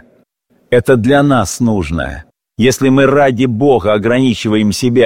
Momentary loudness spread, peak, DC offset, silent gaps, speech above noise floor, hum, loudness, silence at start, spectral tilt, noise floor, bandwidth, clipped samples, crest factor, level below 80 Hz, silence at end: 7 LU; 0 dBFS; 0.8%; none; 45 dB; none; -12 LUFS; 0.7 s; -6 dB/octave; -56 dBFS; 16.5 kHz; under 0.1%; 12 dB; -36 dBFS; 0 s